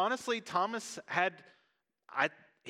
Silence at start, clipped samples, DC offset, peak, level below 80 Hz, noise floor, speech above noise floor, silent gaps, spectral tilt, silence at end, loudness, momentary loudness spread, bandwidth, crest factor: 0 s; under 0.1%; under 0.1%; -14 dBFS; -88 dBFS; -77 dBFS; 43 dB; none; -3 dB/octave; 0 s; -34 LUFS; 5 LU; 15.5 kHz; 22 dB